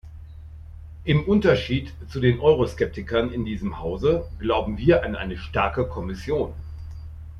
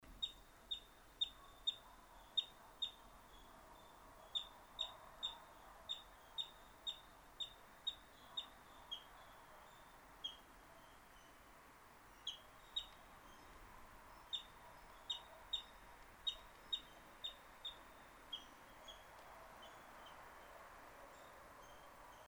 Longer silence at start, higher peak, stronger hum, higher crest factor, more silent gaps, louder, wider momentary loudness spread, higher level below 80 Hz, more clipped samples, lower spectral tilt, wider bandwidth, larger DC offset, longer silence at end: about the same, 0.05 s vs 0 s; first, -6 dBFS vs -28 dBFS; neither; second, 18 dB vs 26 dB; neither; first, -23 LUFS vs -49 LUFS; about the same, 20 LU vs 18 LU; first, -38 dBFS vs -70 dBFS; neither; first, -7.5 dB/octave vs -1 dB/octave; second, 11.5 kHz vs over 20 kHz; neither; about the same, 0 s vs 0 s